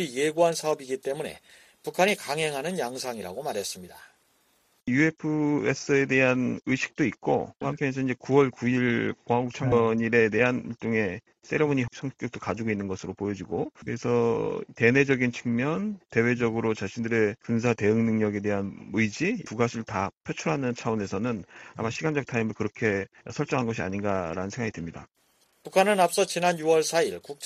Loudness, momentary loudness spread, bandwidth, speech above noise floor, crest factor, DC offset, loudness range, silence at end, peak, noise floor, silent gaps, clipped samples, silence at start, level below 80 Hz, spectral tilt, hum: -27 LUFS; 10 LU; 14.5 kHz; 41 dB; 22 dB; under 0.1%; 5 LU; 0 s; -4 dBFS; -67 dBFS; 20.17-20.21 s; under 0.1%; 0 s; -60 dBFS; -5.5 dB/octave; none